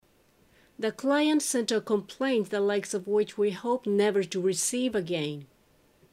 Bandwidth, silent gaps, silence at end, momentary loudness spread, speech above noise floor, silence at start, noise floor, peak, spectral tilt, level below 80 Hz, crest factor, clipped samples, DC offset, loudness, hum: 15.5 kHz; none; 0.65 s; 7 LU; 36 dB; 0.8 s; -64 dBFS; -14 dBFS; -4 dB/octave; -72 dBFS; 16 dB; under 0.1%; under 0.1%; -28 LUFS; none